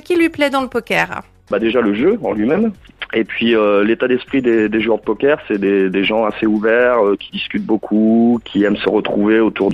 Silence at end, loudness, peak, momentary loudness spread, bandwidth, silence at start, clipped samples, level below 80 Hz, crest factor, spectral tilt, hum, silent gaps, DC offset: 0 s; -15 LUFS; 0 dBFS; 7 LU; 12.5 kHz; 0.1 s; under 0.1%; -48 dBFS; 14 dB; -6.5 dB/octave; none; none; under 0.1%